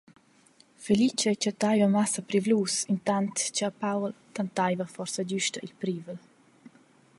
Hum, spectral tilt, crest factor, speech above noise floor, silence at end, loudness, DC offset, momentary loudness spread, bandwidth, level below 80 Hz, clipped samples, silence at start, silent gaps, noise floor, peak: none; -4 dB/octave; 18 dB; 33 dB; 0.5 s; -28 LUFS; under 0.1%; 11 LU; 11.5 kHz; -72 dBFS; under 0.1%; 0.8 s; none; -61 dBFS; -12 dBFS